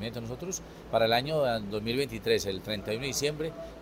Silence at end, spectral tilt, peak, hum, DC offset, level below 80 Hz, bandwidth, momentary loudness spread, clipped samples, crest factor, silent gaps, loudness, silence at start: 0 s; -4 dB/octave; -12 dBFS; none; under 0.1%; -52 dBFS; 16 kHz; 11 LU; under 0.1%; 20 dB; none; -30 LUFS; 0 s